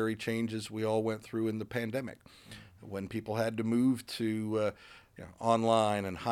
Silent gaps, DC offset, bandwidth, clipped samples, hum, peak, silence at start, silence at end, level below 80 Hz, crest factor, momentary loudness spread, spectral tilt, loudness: none; under 0.1%; 16 kHz; under 0.1%; none; -12 dBFS; 0 s; 0 s; -66 dBFS; 20 dB; 22 LU; -6 dB/octave; -33 LUFS